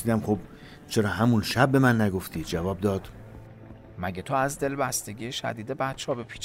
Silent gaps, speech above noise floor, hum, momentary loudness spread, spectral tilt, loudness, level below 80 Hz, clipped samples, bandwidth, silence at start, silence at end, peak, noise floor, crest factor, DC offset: none; 20 dB; none; 24 LU; -5.5 dB/octave; -27 LUFS; -52 dBFS; under 0.1%; 16 kHz; 0 s; 0 s; -6 dBFS; -46 dBFS; 20 dB; under 0.1%